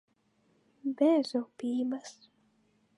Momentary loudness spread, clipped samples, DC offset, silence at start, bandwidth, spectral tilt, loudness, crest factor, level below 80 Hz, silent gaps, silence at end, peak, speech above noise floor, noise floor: 14 LU; under 0.1%; under 0.1%; 0.85 s; 11 kHz; -5 dB/octave; -31 LUFS; 18 dB; -88 dBFS; none; 0.85 s; -14 dBFS; 41 dB; -71 dBFS